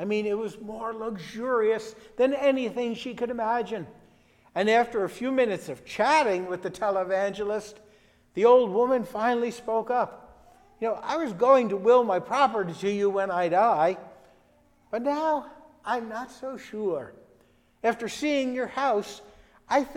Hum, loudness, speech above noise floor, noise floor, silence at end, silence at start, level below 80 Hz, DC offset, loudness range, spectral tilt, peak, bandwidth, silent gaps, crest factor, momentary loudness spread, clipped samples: none; -26 LUFS; 36 dB; -62 dBFS; 0 s; 0 s; -64 dBFS; under 0.1%; 7 LU; -5 dB/octave; -8 dBFS; 13 kHz; none; 18 dB; 15 LU; under 0.1%